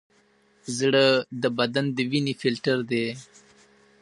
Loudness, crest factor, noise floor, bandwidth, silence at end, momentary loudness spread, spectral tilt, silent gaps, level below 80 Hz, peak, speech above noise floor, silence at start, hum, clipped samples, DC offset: -24 LUFS; 20 dB; -62 dBFS; 11.5 kHz; 0.8 s; 12 LU; -5 dB/octave; none; -72 dBFS; -6 dBFS; 38 dB; 0.65 s; none; under 0.1%; under 0.1%